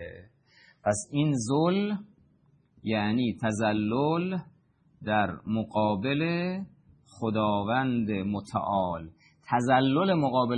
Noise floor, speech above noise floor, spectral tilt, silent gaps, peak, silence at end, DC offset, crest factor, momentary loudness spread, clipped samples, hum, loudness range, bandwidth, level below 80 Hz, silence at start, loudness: -64 dBFS; 38 dB; -6 dB/octave; none; -10 dBFS; 0 s; under 0.1%; 18 dB; 11 LU; under 0.1%; none; 3 LU; 10 kHz; -64 dBFS; 0 s; -28 LUFS